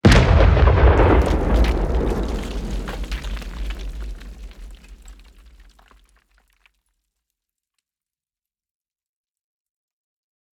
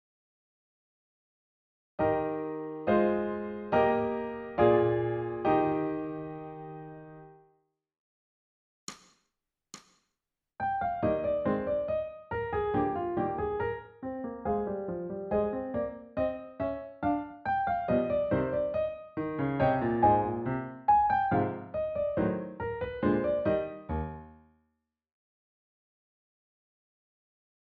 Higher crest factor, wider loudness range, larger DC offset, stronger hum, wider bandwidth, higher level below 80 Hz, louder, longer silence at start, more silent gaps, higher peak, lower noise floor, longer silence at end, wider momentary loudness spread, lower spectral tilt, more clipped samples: about the same, 18 dB vs 20 dB; first, 22 LU vs 10 LU; neither; neither; first, 11.5 kHz vs 7.4 kHz; first, -24 dBFS vs -54 dBFS; first, -18 LUFS vs -30 LUFS; second, 0.05 s vs 2 s; second, none vs 7.99-8.87 s; first, -2 dBFS vs -12 dBFS; about the same, under -90 dBFS vs -87 dBFS; first, 5.45 s vs 3.4 s; first, 21 LU vs 14 LU; about the same, -6.5 dB/octave vs -6.5 dB/octave; neither